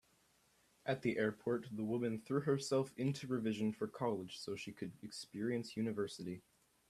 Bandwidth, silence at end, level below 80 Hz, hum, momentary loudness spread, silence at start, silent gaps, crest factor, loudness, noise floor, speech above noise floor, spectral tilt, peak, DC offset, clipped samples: 14 kHz; 0.5 s; -78 dBFS; none; 11 LU; 0.85 s; none; 18 dB; -41 LUFS; -74 dBFS; 34 dB; -6 dB/octave; -22 dBFS; under 0.1%; under 0.1%